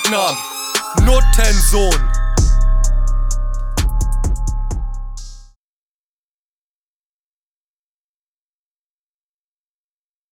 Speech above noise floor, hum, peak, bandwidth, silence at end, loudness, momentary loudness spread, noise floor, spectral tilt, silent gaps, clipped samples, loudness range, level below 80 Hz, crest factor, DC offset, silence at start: over 79 dB; none; 0 dBFS; 16.5 kHz; 4.9 s; -18 LUFS; 12 LU; under -90 dBFS; -4 dB/octave; none; under 0.1%; 15 LU; -18 dBFS; 16 dB; under 0.1%; 0 s